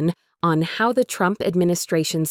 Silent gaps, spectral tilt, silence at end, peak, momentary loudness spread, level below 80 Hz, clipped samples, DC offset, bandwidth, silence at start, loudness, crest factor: none; -5 dB/octave; 0 s; -8 dBFS; 2 LU; -58 dBFS; under 0.1%; under 0.1%; 18 kHz; 0 s; -21 LUFS; 14 dB